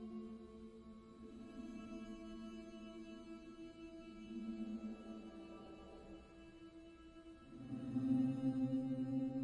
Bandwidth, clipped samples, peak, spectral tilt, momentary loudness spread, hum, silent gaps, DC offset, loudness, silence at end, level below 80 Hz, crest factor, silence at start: 10 kHz; under 0.1%; -28 dBFS; -8 dB/octave; 19 LU; none; none; under 0.1%; -46 LUFS; 0 s; -68 dBFS; 18 dB; 0 s